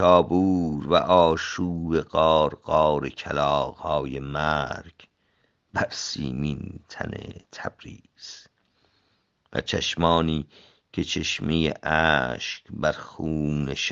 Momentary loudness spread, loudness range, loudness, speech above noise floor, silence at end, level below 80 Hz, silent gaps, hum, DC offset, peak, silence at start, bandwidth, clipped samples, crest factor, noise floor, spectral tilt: 17 LU; 11 LU; -24 LUFS; 45 dB; 0 s; -48 dBFS; none; none; under 0.1%; -2 dBFS; 0 s; 7.8 kHz; under 0.1%; 22 dB; -69 dBFS; -5 dB/octave